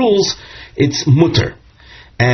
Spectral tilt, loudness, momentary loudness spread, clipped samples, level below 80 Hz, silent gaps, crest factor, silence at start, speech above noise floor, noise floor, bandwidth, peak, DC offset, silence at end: -5 dB/octave; -15 LUFS; 14 LU; under 0.1%; -42 dBFS; none; 14 dB; 0 s; 28 dB; -41 dBFS; 6.4 kHz; 0 dBFS; under 0.1%; 0 s